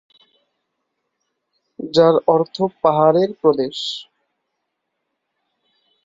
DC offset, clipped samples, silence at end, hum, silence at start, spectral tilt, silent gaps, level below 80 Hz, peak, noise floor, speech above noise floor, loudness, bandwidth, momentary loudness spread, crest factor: under 0.1%; under 0.1%; 2 s; none; 1.8 s; -6.5 dB/octave; none; -66 dBFS; -2 dBFS; -76 dBFS; 60 dB; -17 LUFS; 7.8 kHz; 12 LU; 20 dB